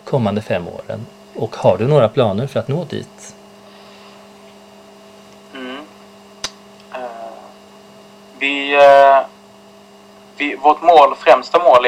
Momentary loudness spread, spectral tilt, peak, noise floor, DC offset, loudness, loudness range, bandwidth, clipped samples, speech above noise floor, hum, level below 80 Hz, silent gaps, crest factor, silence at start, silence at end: 22 LU; -5.5 dB/octave; 0 dBFS; -43 dBFS; under 0.1%; -13 LUFS; 21 LU; 12.5 kHz; under 0.1%; 30 dB; none; -60 dBFS; none; 16 dB; 0.05 s; 0 s